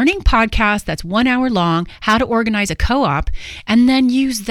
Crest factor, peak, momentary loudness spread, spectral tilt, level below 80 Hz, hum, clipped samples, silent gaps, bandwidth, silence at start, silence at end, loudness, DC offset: 14 dB; 0 dBFS; 7 LU; -5 dB/octave; -24 dBFS; none; under 0.1%; none; 15 kHz; 0 s; 0 s; -15 LUFS; under 0.1%